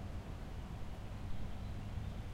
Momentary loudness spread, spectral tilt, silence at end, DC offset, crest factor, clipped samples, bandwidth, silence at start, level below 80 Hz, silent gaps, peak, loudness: 3 LU; -7 dB/octave; 0 s; under 0.1%; 14 dB; under 0.1%; 16 kHz; 0 s; -48 dBFS; none; -28 dBFS; -47 LUFS